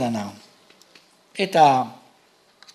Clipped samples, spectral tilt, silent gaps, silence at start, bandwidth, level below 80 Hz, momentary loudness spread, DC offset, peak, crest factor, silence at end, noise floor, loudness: under 0.1%; -5 dB/octave; none; 0 s; 13.5 kHz; -72 dBFS; 20 LU; under 0.1%; -4 dBFS; 20 dB; 0.8 s; -58 dBFS; -20 LUFS